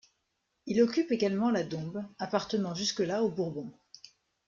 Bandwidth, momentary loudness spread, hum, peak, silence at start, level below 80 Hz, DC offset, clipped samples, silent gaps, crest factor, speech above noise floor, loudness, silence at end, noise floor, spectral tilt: 7.6 kHz; 12 LU; none; -12 dBFS; 0.65 s; -70 dBFS; under 0.1%; under 0.1%; none; 18 dB; 50 dB; -31 LUFS; 0.75 s; -80 dBFS; -5 dB/octave